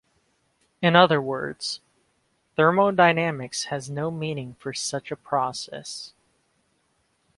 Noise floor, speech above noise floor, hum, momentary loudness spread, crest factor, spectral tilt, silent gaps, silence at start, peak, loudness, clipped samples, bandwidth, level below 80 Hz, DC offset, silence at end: -69 dBFS; 46 dB; none; 16 LU; 24 dB; -4.5 dB/octave; none; 0.8 s; -2 dBFS; -24 LUFS; under 0.1%; 11.5 kHz; -66 dBFS; under 0.1%; 1.3 s